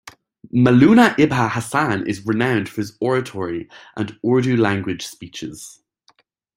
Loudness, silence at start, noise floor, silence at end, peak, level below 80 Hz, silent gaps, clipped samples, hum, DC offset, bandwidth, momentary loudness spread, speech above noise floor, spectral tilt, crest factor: -18 LUFS; 0.05 s; -60 dBFS; 0.85 s; -2 dBFS; -54 dBFS; none; under 0.1%; none; under 0.1%; 16 kHz; 19 LU; 42 dB; -6.5 dB/octave; 18 dB